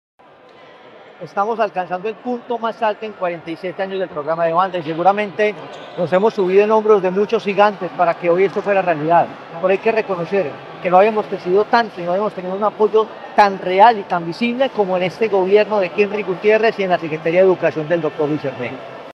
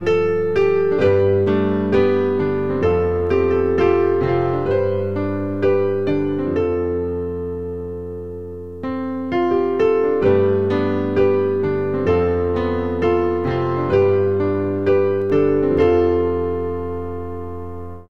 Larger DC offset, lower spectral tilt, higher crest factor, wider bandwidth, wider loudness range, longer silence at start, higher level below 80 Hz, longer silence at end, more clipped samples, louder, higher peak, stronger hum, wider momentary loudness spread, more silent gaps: second, under 0.1% vs 1%; second, -7 dB/octave vs -9 dB/octave; about the same, 18 dB vs 14 dB; first, 7 kHz vs 6.2 kHz; about the same, 6 LU vs 4 LU; first, 1.2 s vs 0 s; second, -68 dBFS vs -42 dBFS; about the same, 0 s vs 0 s; neither; about the same, -17 LUFS vs -19 LUFS; first, 0 dBFS vs -4 dBFS; neither; about the same, 11 LU vs 11 LU; neither